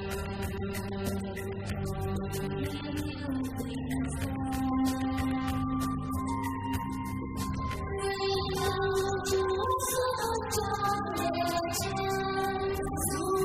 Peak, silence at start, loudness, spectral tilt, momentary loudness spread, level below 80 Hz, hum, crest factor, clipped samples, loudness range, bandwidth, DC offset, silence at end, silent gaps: -18 dBFS; 0 s; -32 LUFS; -5 dB/octave; 6 LU; -44 dBFS; none; 14 dB; under 0.1%; 5 LU; 16.5 kHz; under 0.1%; 0 s; none